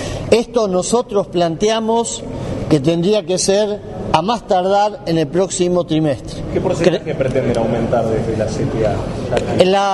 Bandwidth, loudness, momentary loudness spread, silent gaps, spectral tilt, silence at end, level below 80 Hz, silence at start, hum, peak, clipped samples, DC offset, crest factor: 11.5 kHz; -17 LUFS; 6 LU; none; -5.5 dB/octave; 0 s; -36 dBFS; 0 s; none; 0 dBFS; under 0.1%; under 0.1%; 16 dB